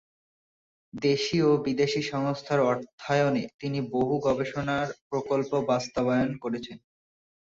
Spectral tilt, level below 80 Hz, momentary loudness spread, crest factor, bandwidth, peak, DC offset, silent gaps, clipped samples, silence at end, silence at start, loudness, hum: -6 dB/octave; -60 dBFS; 8 LU; 16 dB; 7.8 kHz; -12 dBFS; under 0.1%; 2.93-2.98 s, 3.54-3.59 s, 5.01-5.10 s; under 0.1%; 0.8 s; 0.95 s; -27 LUFS; none